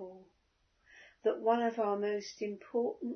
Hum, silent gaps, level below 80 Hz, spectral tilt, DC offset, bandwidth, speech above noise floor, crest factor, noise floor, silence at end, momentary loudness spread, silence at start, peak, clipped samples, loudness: none; none; -80 dBFS; -4 dB/octave; under 0.1%; 6.4 kHz; 41 dB; 20 dB; -75 dBFS; 0 s; 10 LU; 0 s; -16 dBFS; under 0.1%; -34 LUFS